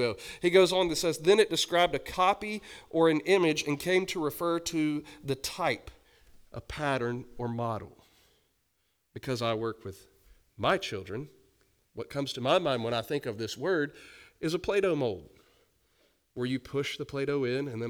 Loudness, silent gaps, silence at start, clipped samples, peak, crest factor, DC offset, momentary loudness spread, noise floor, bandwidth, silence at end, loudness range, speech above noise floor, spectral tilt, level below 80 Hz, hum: -29 LUFS; none; 0 s; under 0.1%; -8 dBFS; 22 dB; under 0.1%; 16 LU; -76 dBFS; over 20 kHz; 0 s; 10 LU; 46 dB; -4.5 dB/octave; -58 dBFS; none